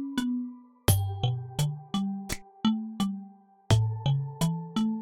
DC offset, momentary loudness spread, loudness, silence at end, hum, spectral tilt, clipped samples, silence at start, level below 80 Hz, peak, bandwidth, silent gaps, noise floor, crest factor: under 0.1%; 8 LU; -30 LUFS; 0 s; none; -5.5 dB/octave; under 0.1%; 0 s; -48 dBFS; -8 dBFS; 19 kHz; none; -50 dBFS; 20 dB